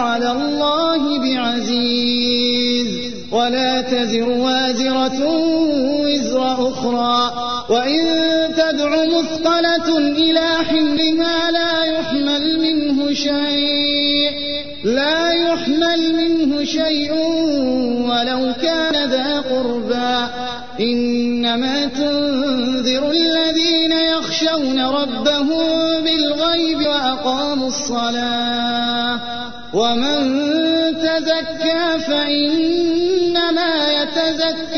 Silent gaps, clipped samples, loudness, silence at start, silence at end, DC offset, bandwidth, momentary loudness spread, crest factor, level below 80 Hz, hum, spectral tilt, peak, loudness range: none; under 0.1%; -17 LUFS; 0 s; 0 s; 2%; 6.6 kHz; 4 LU; 12 dB; -48 dBFS; none; -3.5 dB/octave; -4 dBFS; 3 LU